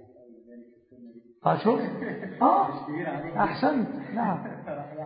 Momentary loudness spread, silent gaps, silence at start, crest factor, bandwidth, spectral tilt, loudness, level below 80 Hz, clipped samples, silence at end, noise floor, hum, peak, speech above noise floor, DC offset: 12 LU; none; 0 s; 20 dB; 5.2 kHz; -11 dB/octave; -27 LUFS; -64 dBFS; under 0.1%; 0 s; -52 dBFS; none; -8 dBFS; 24 dB; under 0.1%